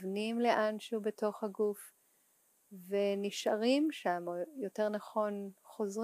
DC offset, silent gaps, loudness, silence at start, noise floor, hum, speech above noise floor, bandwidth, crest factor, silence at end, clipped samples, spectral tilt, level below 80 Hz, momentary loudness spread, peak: under 0.1%; none; -35 LUFS; 0 s; -72 dBFS; none; 37 dB; 15.5 kHz; 20 dB; 0 s; under 0.1%; -5 dB/octave; under -90 dBFS; 10 LU; -16 dBFS